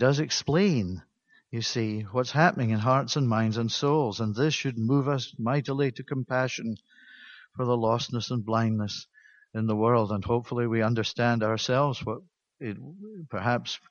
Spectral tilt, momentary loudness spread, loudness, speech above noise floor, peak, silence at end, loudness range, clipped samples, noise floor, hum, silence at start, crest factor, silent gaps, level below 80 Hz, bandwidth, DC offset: -5.5 dB/octave; 14 LU; -27 LUFS; 24 dB; -6 dBFS; 0.15 s; 4 LU; under 0.1%; -51 dBFS; none; 0 s; 22 dB; none; -62 dBFS; 7.2 kHz; under 0.1%